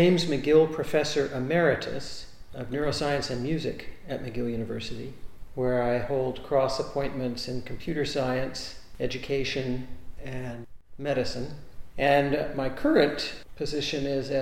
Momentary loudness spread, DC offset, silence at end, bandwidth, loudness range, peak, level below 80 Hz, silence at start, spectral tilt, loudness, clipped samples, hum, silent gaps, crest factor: 17 LU; under 0.1%; 0 s; 16 kHz; 5 LU; -6 dBFS; -46 dBFS; 0 s; -5.5 dB/octave; -28 LUFS; under 0.1%; none; none; 22 dB